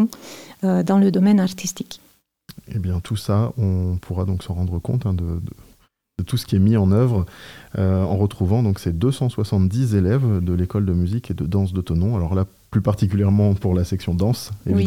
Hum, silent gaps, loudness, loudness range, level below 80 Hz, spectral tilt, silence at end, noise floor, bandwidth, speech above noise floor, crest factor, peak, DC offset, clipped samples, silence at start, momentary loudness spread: none; none; -21 LUFS; 4 LU; -44 dBFS; -7.5 dB/octave; 0 s; -56 dBFS; 16 kHz; 37 dB; 14 dB; -6 dBFS; under 0.1%; under 0.1%; 0 s; 11 LU